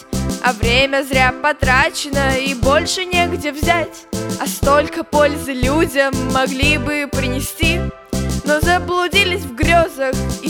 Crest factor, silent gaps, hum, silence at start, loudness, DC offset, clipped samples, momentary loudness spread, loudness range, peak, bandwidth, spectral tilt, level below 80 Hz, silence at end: 16 dB; none; none; 0 s; -16 LUFS; under 0.1%; under 0.1%; 7 LU; 2 LU; 0 dBFS; over 20 kHz; -4 dB/octave; -28 dBFS; 0 s